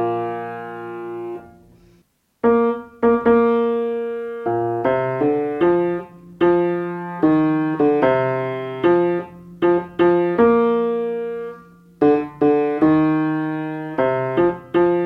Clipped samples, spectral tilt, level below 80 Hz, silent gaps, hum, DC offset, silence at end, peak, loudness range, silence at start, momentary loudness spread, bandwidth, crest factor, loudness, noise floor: under 0.1%; -9.5 dB/octave; -54 dBFS; none; none; under 0.1%; 0 s; -4 dBFS; 2 LU; 0 s; 13 LU; 4.7 kHz; 16 dB; -19 LUFS; -59 dBFS